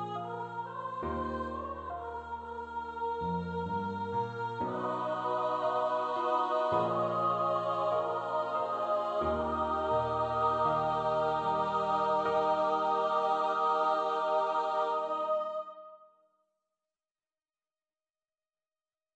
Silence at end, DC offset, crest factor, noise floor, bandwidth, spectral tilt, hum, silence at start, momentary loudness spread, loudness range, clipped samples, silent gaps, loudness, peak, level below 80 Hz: 3.1 s; under 0.1%; 16 dB; under -90 dBFS; 8.4 kHz; -6.5 dB/octave; none; 0 s; 10 LU; 8 LU; under 0.1%; none; -32 LUFS; -18 dBFS; -58 dBFS